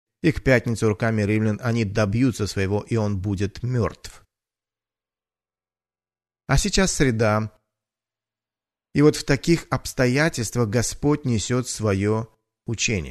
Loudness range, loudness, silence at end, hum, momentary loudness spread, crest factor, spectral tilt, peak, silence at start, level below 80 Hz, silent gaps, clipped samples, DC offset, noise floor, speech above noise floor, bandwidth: 7 LU; -22 LUFS; 0 s; none; 8 LU; 20 dB; -5.5 dB/octave; -4 dBFS; 0.25 s; -38 dBFS; none; under 0.1%; under 0.1%; under -90 dBFS; over 69 dB; 13.5 kHz